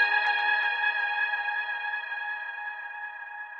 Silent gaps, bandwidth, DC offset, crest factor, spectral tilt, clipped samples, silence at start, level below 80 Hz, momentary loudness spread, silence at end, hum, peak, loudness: none; 6.6 kHz; under 0.1%; 16 dB; 0.5 dB/octave; under 0.1%; 0 s; -88 dBFS; 13 LU; 0 s; none; -12 dBFS; -28 LUFS